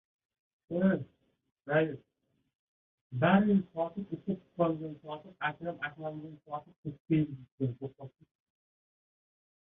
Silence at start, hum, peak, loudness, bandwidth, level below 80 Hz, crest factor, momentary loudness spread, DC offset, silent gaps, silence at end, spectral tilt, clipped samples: 0.7 s; none; -12 dBFS; -33 LUFS; 3.9 kHz; -68 dBFS; 22 dB; 18 LU; under 0.1%; 1.52-1.56 s, 2.55-3.10 s, 6.78-6.83 s, 7.00-7.05 s, 7.52-7.58 s; 1.6 s; -10.5 dB/octave; under 0.1%